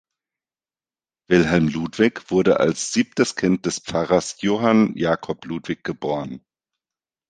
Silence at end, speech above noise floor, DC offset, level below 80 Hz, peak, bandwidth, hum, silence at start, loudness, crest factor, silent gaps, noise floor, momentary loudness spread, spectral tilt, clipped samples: 0.9 s; over 70 dB; under 0.1%; -52 dBFS; -2 dBFS; 9.8 kHz; none; 1.3 s; -21 LUFS; 20 dB; none; under -90 dBFS; 11 LU; -5 dB/octave; under 0.1%